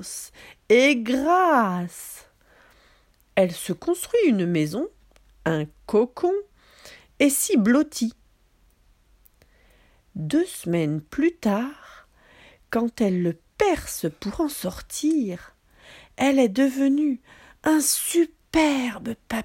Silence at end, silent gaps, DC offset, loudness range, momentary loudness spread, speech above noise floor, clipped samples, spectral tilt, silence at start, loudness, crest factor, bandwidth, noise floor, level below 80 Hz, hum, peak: 0 s; none; under 0.1%; 5 LU; 12 LU; 38 dB; under 0.1%; -4.5 dB/octave; 0 s; -23 LUFS; 18 dB; 16.5 kHz; -60 dBFS; -54 dBFS; none; -6 dBFS